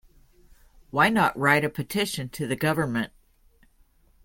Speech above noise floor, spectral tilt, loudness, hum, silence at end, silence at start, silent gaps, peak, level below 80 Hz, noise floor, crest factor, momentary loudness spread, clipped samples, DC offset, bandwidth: 36 dB; -5 dB/octave; -24 LUFS; none; 1.2 s; 0.95 s; none; -6 dBFS; -56 dBFS; -60 dBFS; 20 dB; 10 LU; under 0.1%; under 0.1%; 17 kHz